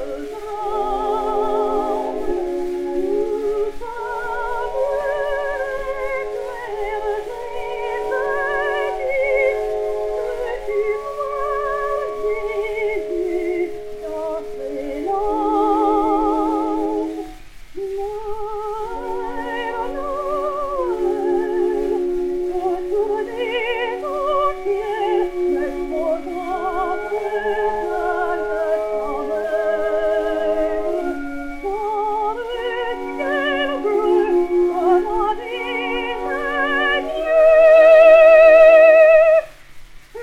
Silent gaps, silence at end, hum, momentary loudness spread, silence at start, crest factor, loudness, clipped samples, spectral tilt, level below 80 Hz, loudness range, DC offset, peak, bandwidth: none; 0 s; none; 12 LU; 0 s; 18 dB; -19 LUFS; under 0.1%; -5 dB/octave; -40 dBFS; 11 LU; under 0.1%; 0 dBFS; 12 kHz